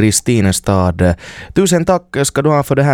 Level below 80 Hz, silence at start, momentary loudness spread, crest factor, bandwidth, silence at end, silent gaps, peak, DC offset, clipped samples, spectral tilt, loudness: -34 dBFS; 0 s; 4 LU; 12 dB; 18 kHz; 0 s; none; 0 dBFS; under 0.1%; under 0.1%; -5 dB/octave; -14 LUFS